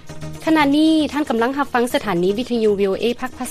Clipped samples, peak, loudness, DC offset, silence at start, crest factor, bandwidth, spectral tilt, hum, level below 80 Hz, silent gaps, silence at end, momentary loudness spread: under 0.1%; -4 dBFS; -18 LUFS; under 0.1%; 0.05 s; 14 dB; 14.5 kHz; -5 dB/octave; none; -46 dBFS; none; 0 s; 7 LU